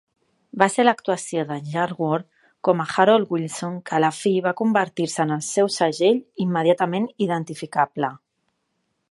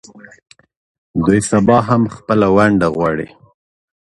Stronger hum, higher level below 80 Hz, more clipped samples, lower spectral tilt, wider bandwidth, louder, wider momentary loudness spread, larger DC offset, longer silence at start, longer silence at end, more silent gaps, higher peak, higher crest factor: neither; second, -72 dBFS vs -42 dBFS; neither; second, -5 dB/octave vs -6.5 dB/octave; about the same, 11.5 kHz vs 11.5 kHz; second, -22 LUFS vs -14 LUFS; about the same, 9 LU vs 10 LU; neither; second, 0.55 s vs 1.15 s; about the same, 0.95 s vs 0.9 s; neither; about the same, 0 dBFS vs 0 dBFS; first, 22 dB vs 16 dB